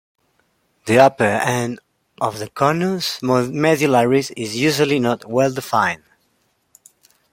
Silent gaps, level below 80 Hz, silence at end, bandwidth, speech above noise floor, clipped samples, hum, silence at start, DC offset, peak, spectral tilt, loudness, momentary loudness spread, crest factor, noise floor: none; -60 dBFS; 1.35 s; 16.5 kHz; 48 dB; under 0.1%; none; 0.85 s; under 0.1%; -2 dBFS; -5 dB/octave; -18 LUFS; 11 LU; 18 dB; -65 dBFS